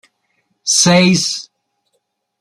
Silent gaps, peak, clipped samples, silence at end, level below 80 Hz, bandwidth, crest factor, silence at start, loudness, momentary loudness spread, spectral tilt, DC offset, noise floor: none; 0 dBFS; under 0.1%; 1 s; -56 dBFS; 13 kHz; 16 dB; 0.65 s; -12 LUFS; 15 LU; -3.5 dB/octave; under 0.1%; -69 dBFS